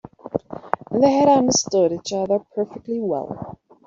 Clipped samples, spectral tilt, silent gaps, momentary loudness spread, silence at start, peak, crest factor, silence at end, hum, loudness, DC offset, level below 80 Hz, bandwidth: under 0.1%; -4.5 dB/octave; none; 14 LU; 0.25 s; 0 dBFS; 20 dB; 0.3 s; none; -20 LUFS; under 0.1%; -58 dBFS; 7.6 kHz